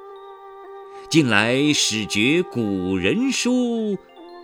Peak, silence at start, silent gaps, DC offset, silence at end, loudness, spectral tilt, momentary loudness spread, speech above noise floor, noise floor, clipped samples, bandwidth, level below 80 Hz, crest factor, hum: 0 dBFS; 0 s; none; under 0.1%; 0 s; -20 LUFS; -4 dB/octave; 23 LU; 21 dB; -40 dBFS; under 0.1%; 17 kHz; -60 dBFS; 20 dB; none